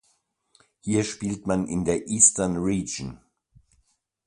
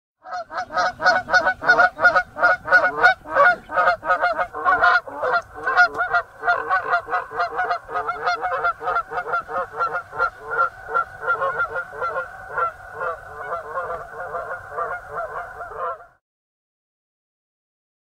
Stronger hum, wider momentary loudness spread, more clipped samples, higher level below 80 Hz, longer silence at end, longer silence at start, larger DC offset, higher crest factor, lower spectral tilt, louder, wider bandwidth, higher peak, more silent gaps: neither; first, 16 LU vs 13 LU; neither; about the same, -50 dBFS vs -54 dBFS; second, 1.1 s vs 2 s; first, 0.85 s vs 0.25 s; neither; about the same, 26 dB vs 22 dB; about the same, -4 dB/octave vs -3 dB/octave; about the same, -23 LUFS vs -21 LUFS; about the same, 11.5 kHz vs 12 kHz; about the same, -2 dBFS vs -2 dBFS; neither